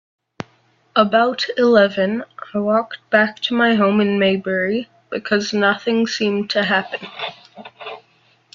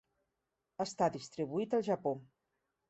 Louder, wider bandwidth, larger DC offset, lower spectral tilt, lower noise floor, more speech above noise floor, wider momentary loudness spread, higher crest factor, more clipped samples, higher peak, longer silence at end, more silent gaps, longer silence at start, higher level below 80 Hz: first, -18 LUFS vs -36 LUFS; second, 7.4 kHz vs 8.2 kHz; neither; about the same, -5 dB/octave vs -6 dB/octave; second, -58 dBFS vs -87 dBFS; second, 40 dB vs 51 dB; first, 17 LU vs 9 LU; about the same, 18 dB vs 20 dB; neither; first, 0 dBFS vs -18 dBFS; about the same, 0.55 s vs 0.65 s; neither; first, 0.95 s vs 0.8 s; first, -62 dBFS vs -78 dBFS